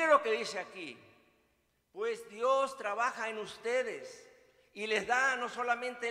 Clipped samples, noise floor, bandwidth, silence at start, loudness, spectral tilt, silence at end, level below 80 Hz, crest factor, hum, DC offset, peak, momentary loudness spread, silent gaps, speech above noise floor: under 0.1%; -75 dBFS; 15 kHz; 0 s; -33 LUFS; -2 dB/octave; 0 s; -78 dBFS; 22 dB; none; under 0.1%; -14 dBFS; 17 LU; none; 41 dB